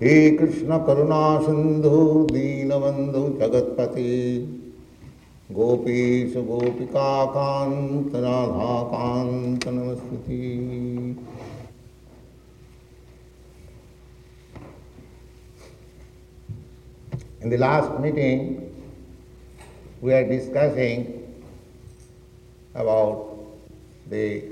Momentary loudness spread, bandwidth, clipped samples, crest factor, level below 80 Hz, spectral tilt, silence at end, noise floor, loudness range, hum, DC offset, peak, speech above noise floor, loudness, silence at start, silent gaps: 21 LU; 10 kHz; under 0.1%; 20 dB; -50 dBFS; -8 dB/octave; 0 s; -49 dBFS; 13 LU; none; under 0.1%; -4 dBFS; 27 dB; -22 LUFS; 0 s; none